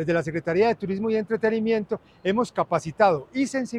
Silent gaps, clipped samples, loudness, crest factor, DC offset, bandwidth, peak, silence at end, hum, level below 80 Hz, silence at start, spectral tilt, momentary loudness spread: none; under 0.1%; -24 LUFS; 18 dB; under 0.1%; 11 kHz; -6 dBFS; 0 s; none; -58 dBFS; 0 s; -6 dB/octave; 5 LU